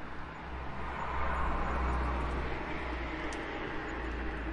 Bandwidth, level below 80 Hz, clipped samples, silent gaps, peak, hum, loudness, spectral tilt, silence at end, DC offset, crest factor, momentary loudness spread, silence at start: 10.5 kHz; -40 dBFS; under 0.1%; none; -20 dBFS; none; -37 LUFS; -6.5 dB/octave; 0 s; under 0.1%; 16 dB; 8 LU; 0 s